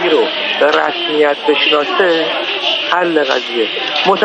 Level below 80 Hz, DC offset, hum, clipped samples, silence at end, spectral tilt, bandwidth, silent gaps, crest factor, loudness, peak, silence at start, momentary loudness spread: -62 dBFS; under 0.1%; none; under 0.1%; 0 s; -3.5 dB/octave; 9 kHz; none; 14 dB; -13 LUFS; 0 dBFS; 0 s; 4 LU